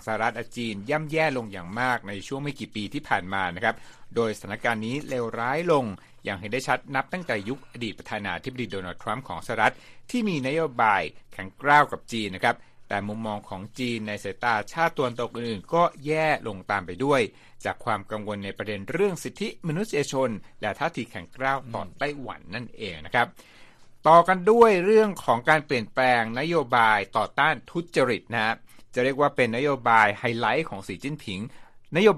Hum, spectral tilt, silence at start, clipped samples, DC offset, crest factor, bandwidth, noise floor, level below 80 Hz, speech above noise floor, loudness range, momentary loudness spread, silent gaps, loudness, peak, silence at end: none; -5 dB/octave; 0 s; under 0.1%; under 0.1%; 22 dB; 14 kHz; -49 dBFS; -56 dBFS; 23 dB; 8 LU; 14 LU; none; -25 LUFS; -4 dBFS; 0 s